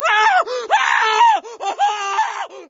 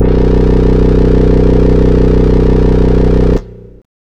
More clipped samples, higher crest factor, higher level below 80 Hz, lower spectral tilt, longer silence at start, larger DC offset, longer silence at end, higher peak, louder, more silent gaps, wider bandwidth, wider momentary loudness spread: second, under 0.1% vs 0.6%; first, 14 dB vs 8 dB; second, -68 dBFS vs -12 dBFS; second, 1.5 dB/octave vs -9.5 dB/octave; about the same, 0 s vs 0 s; neither; second, 0.05 s vs 0.5 s; about the same, -2 dBFS vs 0 dBFS; second, -16 LUFS vs -10 LUFS; neither; first, 8 kHz vs 6.2 kHz; first, 7 LU vs 1 LU